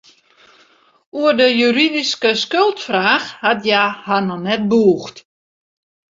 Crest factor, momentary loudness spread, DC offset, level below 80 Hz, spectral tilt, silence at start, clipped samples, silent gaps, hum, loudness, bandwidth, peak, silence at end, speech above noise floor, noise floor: 16 dB; 6 LU; under 0.1%; -62 dBFS; -4.5 dB/octave; 1.15 s; under 0.1%; none; none; -15 LUFS; 7.8 kHz; 0 dBFS; 0.9 s; 37 dB; -53 dBFS